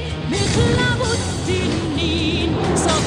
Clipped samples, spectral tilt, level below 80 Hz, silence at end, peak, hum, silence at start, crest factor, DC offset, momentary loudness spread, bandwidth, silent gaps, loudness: under 0.1%; -4.5 dB/octave; -32 dBFS; 0 s; -4 dBFS; none; 0 s; 14 dB; under 0.1%; 4 LU; 13.5 kHz; none; -19 LUFS